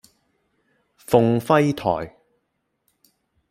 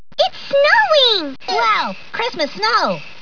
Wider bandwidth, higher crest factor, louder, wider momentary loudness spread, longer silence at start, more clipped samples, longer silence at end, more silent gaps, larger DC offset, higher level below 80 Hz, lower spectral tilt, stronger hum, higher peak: first, 16 kHz vs 5.4 kHz; first, 22 dB vs 16 dB; second, -20 LUFS vs -15 LUFS; about the same, 9 LU vs 10 LU; first, 1.1 s vs 0.2 s; neither; first, 1.4 s vs 0.1 s; neither; second, under 0.1% vs 2%; about the same, -56 dBFS vs -60 dBFS; first, -7 dB/octave vs -2.5 dB/octave; neither; about the same, -2 dBFS vs -2 dBFS